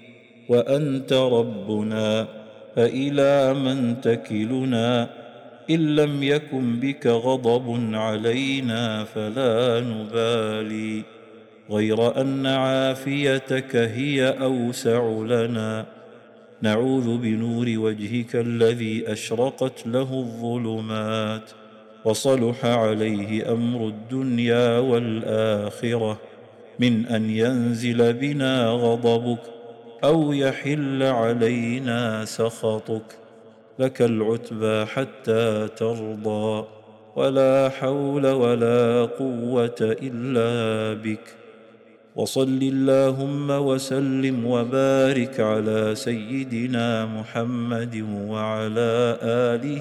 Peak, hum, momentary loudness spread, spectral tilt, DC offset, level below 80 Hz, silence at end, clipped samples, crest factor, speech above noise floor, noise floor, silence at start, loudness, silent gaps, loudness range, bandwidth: -10 dBFS; none; 8 LU; -6 dB/octave; under 0.1%; -64 dBFS; 0 s; under 0.1%; 14 dB; 29 dB; -51 dBFS; 0.1 s; -23 LUFS; none; 3 LU; 13 kHz